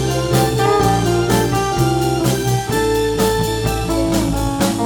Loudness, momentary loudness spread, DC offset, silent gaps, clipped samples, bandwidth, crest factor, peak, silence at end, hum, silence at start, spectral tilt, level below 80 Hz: -17 LUFS; 4 LU; under 0.1%; none; under 0.1%; 19.5 kHz; 14 dB; -2 dBFS; 0 s; none; 0 s; -5.5 dB/octave; -30 dBFS